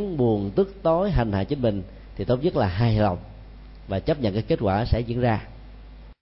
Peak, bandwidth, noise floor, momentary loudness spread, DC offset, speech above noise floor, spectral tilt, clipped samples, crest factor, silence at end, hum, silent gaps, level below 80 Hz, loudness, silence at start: -8 dBFS; 5.8 kHz; -43 dBFS; 11 LU; under 0.1%; 20 dB; -12 dB/octave; under 0.1%; 16 dB; 0.1 s; none; none; -36 dBFS; -24 LUFS; 0 s